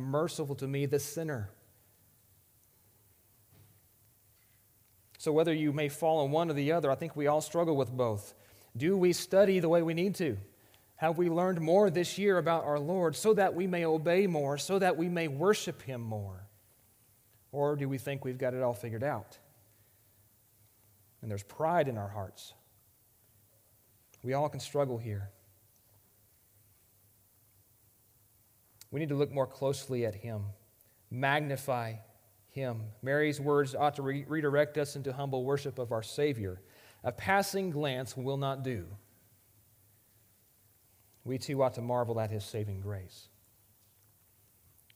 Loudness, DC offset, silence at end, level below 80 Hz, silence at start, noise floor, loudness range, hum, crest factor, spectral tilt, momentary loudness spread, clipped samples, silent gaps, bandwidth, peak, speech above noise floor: -32 LUFS; under 0.1%; 1.75 s; -72 dBFS; 0 s; -66 dBFS; 10 LU; none; 22 dB; -6 dB/octave; 14 LU; under 0.1%; none; 16.5 kHz; -12 dBFS; 35 dB